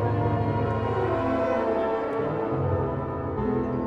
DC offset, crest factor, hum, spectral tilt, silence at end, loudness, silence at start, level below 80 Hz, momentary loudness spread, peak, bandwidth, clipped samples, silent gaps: under 0.1%; 12 dB; none; -9.5 dB/octave; 0 s; -26 LUFS; 0 s; -44 dBFS; 3 LU; -14 dBFS; 6.4 kHz; under 0.1%; none